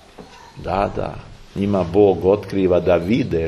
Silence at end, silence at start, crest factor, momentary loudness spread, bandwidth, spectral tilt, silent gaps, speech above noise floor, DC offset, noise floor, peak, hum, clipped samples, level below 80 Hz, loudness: 0 s; 0.2 s; 18 dB; 16 LU; 12 kHz; -8 dB/octave; none; 24 dB; under 0.1%; -41 dBFS; -2 dBFS; none; under 0.1%; -40 dBFS; -18 LUFS